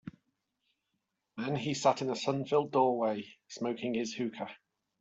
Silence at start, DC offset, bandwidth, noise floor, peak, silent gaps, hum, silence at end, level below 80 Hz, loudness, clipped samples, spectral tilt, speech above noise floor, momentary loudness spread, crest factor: 0.05 s; under 0.1%; 8.2 kHz; -83 dBFS; -14 dBFS; none; none; 0.45 s; -76 dBFS; -32 LUFS; under 0.1%; -5 dB/octave; 51 dB; 15 LU; 20 dB